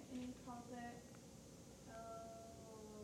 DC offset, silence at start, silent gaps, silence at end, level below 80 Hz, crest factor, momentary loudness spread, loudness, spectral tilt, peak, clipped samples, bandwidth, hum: under 0.1%; 0 s; none; 0 s; -72 dBFS; 14 dB; 8 LU; -55 LUFS; -5 dB/octave; -40 dBFS; under 0.1%; 17 kHz; none